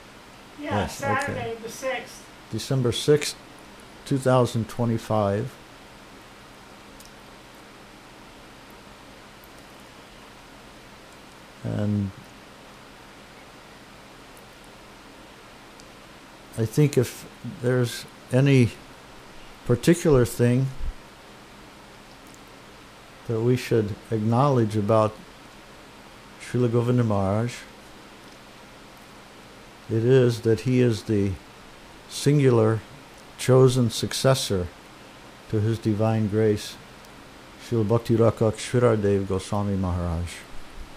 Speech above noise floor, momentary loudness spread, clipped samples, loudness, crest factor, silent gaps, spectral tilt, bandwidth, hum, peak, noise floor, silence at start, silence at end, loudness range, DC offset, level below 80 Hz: 24 dB; 25 LU; under 0.1%; -23 LUFS; 22 dB; none; -6.5 dB/octave; 15.5 kHz; none; -4 dBFS; -46 dBFS; 0.1 s; 0 s; 23 LU; under 0.1%; -48 dBFS